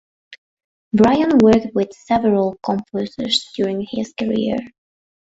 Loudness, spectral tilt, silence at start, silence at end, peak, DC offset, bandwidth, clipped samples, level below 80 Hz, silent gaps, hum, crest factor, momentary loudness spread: -18 LUFS; -6 dB/octave; 0.3 s; 0.6 s; -2 dBFS; under 0.1%; 8 kHz; under 0.1%; -50 dBFS; 0.38-0.57 s, 0.64-0.91 s; none; 16 dB; 11 LU